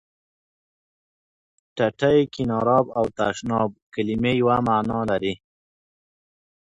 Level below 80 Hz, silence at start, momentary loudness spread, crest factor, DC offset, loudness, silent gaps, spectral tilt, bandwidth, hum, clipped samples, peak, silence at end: -52 dBFS; 1.75 s; 8 LU; 20 dB; under 0.1%; -22 LUFS; 3.82-3.92 s; -6.5 dB/octave; 10.5 kHz; none; under 0.1%; -4 dBFS; 1.35 s